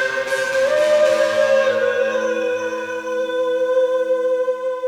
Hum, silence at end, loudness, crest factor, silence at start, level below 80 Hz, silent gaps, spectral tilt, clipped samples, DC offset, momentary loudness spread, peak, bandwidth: 50 Hz at -65 dBFS; 0 s; -18 LUFS; 14 dB; 0 s; -62 dBFS; none; -2.5 dB/octave; under 0.1%; under 0.1%; 8 LU; -4 dBFS; 13 kHz